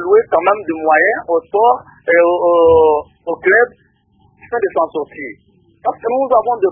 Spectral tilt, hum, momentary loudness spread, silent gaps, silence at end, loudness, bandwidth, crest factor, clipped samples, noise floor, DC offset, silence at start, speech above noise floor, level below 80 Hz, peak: -10.5 dB/octave; none; 12 LU; none; 0 s; -14 LUFS; 3.5 kHz; 14 dB; under 0.1%; -54 dBFS; under 0.1%; 0 s; 41 dB; -48 dBFS; 0 dBFS